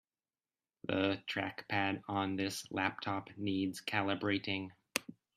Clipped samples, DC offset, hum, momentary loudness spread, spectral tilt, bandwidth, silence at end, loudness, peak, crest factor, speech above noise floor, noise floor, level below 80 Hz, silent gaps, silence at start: under 0.1%; under 0.1%; none; 6 LU; -4.5 dB/octave; 14.5 kHz; 0.25 s; -37 LUFS; -12 dBFS; 26 dB; over 53 dB; under -90 dBFS; -78 dBFS; none; 0.85 s